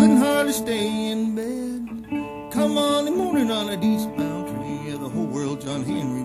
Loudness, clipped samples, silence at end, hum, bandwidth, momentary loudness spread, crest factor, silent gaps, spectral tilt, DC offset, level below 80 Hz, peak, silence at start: -24 LUFS; under 0.1%; 0 s; none; 15 kHz; 10 LU; 18 dB; none; -5 dB/octave; under 0.1%; -54 dBFS; -6 dBFS; 0 s